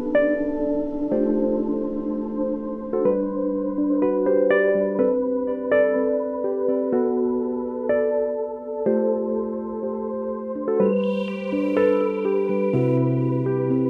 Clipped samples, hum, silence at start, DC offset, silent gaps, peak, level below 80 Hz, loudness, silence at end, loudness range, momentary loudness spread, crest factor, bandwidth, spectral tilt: under 0.1%; none; 0 s; under 0.1%; none; -8 dBFS; -50 dBFS; -23 LUFS; 0 s; 3 LU; 7 LU; 14 dB; 5 kHz; -10 dB/octave